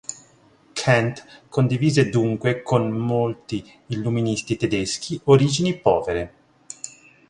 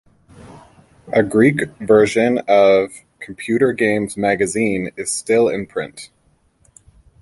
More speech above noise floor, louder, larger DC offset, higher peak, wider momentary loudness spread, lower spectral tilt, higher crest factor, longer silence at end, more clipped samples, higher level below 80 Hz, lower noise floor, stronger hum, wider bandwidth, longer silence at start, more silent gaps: second, 34 dB vs 42 dB; second, -21 LUFS vs -17 LUFS; neither; about the same, -2 dBFS vs 0 dBFS; first, 18 LU vs 14 LU; about the same, -5.5 dB/octave vs -5 dB/octave; about the same, 20 dB vs 18 dB; second, 0.4 s vs 1.15 s; neither; about the same, -52 dBFS vs -52 dBFS; second, -55 dBFS vs -59 dBFS; neither; about the same, 11 kHz vs 11.5 kHz; second, 0.1 s vs 0.45 s; neither